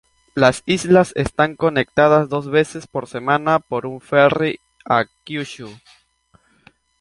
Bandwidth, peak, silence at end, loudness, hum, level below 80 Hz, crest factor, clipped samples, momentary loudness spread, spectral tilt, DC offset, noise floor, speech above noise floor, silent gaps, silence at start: 11.5 kHz; -2 dBFS; 1.25 s; -18 LUFS; none; -50 dBFS; 18 dB; under 0.1%; 13 LU; -5.5 dB/octave; under 0.1%; -58 dBFS; 40 dB; none; 0.35 s